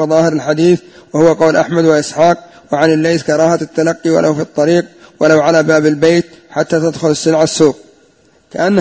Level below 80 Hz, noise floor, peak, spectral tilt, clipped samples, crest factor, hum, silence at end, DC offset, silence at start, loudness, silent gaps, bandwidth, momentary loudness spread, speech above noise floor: -52 dBFS; -50 dBFS; 0 dBFS; -5.5 dB/octave; 0.2%; 12 dB; none; 0 s; under 0.1%; 0 s; -12 LUFS; none; 8 kHz; 7 LU; 38 dB